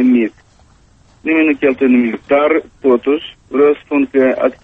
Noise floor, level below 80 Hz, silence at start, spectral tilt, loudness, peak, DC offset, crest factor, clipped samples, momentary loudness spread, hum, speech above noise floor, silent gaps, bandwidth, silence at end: -48 dBFS; -52 dBFS; 0 s; -7 dB/octave; -14 LUFS; -2 dBFS; under 0.1%; 12 dB; under 0.1%; 6 LU; none; 35 dB; none; 3.9 kHz; 0.1 s